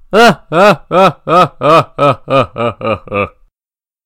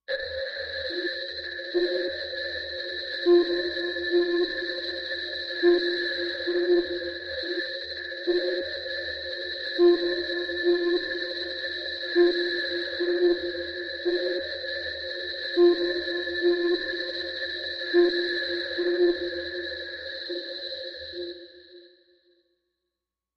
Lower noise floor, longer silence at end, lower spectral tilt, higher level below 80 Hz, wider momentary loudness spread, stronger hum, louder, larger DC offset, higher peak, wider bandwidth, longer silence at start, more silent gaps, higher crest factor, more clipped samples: about the same, under -90 dBFS vs -87 dBFS; second, 0.8 s vs 1.5 s; about the same, -5.5 dB/octave vs -4.5 dB/octave; first, -42 dBFS vs -60 dBFS; about the same, 9 LU vs 11 LU; neither; first, -11 LUFS vs -27 LUFS; neither; first, 0 dBFS vs -10 dBFS; first, 16.5 kHz vs 6 kHz; about the same, 0.1 s vs 0.1 s; neither; about the same, 12 dB vs 16 dB; first, 1% vs under 0.1%